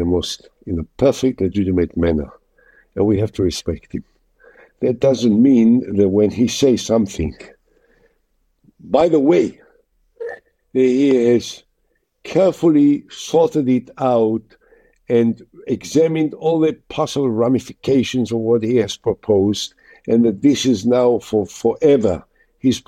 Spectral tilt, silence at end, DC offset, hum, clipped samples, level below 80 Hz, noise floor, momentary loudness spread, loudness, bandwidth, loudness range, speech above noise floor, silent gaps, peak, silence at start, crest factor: -6 dB/octave; 0.1 s; under 0.1%; none; under 0.1%; -44 dBFS; -66 dBFS; 13 LU; -17 LUFS; 13.5 kHz; 4 LU; 50 dB; none; 0 dBFS; 0 s; 16 dB